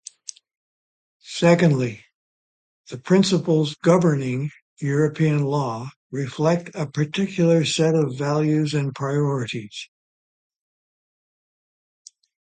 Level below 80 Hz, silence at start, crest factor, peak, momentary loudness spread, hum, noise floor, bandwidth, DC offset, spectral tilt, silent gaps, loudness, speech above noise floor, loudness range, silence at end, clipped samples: -64 dBFS; 1.25 s; 20 dB; -4 dBFS; 17 LU; none; -42 dBFS; 9.4 kHz; under 0.1%; -6.5 dB/octave; 2.14-2.84 s, 4.62-4.76 s, 5.96-6.10 s; -21 LUFS; 21 dB; 7 LU; 2.7 s; under 0.1%